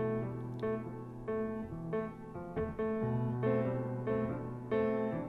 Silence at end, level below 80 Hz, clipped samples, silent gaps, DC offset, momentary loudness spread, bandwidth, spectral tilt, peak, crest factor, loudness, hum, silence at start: 0 s; -58 dBFS; under 0.1%; none; under 0.1%; 9 LU; 4.9 kHz; -10 dB/octave; -20 dBFS; 14 dB; -37 LUFS; none; 0 s